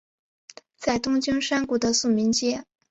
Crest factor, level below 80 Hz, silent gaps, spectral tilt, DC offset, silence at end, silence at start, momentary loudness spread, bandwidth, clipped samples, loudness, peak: 16 dB; -56 dBFS; none; -3 dB/octave; under 0.1%; 0.3 s; 0.8 s; 7 LU; 8.4 kHz; under 0.1%; -24 LUFS; -10 dBFS